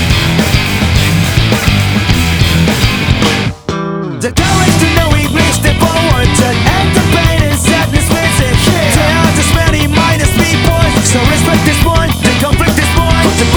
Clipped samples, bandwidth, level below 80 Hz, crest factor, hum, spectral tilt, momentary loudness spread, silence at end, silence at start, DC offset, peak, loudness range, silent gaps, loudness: 0.6%; over 20 kHz; -18 dBFS; 10 dB; none; -4.5 dB/octave; 2 LU; 0 s; 0 s; under 0.1%; 0 dBFS; 2 LU; none; -10 LUFS